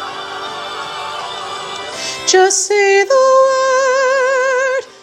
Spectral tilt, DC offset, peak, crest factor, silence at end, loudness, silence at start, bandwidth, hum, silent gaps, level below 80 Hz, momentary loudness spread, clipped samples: -0.5 dB/octave; under 0.1%; 0 dBFS; 14 dB; 0.1 s; -14 LUFS; 0 s; 13 kHz; none; none; -62 dBFS; 13 LU; under 0.1%